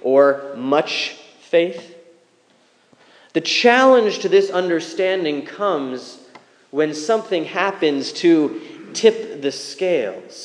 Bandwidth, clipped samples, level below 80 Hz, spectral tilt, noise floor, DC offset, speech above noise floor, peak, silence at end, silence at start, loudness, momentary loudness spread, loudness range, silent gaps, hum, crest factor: 10.5 kHz; under 0.1%; -86 dBFS; -4 dB/octave; -57 dBFS; under 0.1%; 39 dB; 0 dBFS; 0 s; 0.05 s; -18 LUFS; 12 LU; 5 LU; none; none; 18 dB